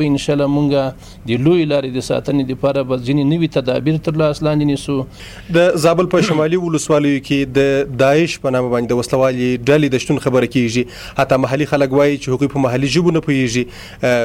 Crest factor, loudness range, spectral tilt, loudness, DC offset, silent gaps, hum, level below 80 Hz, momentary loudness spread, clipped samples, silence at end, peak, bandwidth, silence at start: 12 dB; 2 LU; -6 dB/octave; -16 LUFS; under 0.1%; none; none; -42 dBFS; 6 LU; under 0.1%; 0 s; -4 dBFS; 16 kHz; 0 s